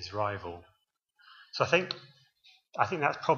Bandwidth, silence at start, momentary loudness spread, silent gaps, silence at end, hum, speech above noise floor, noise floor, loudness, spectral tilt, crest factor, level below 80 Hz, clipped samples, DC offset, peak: 7.2 kHz; 0 s; 16 LU; none; 0 s; none; 39 dB; -70 dBFS; -31 LUFS; -5 dB/octave; 24 dB; -68 dBFS; under 0.1%; under 0.1%; -8 dBFS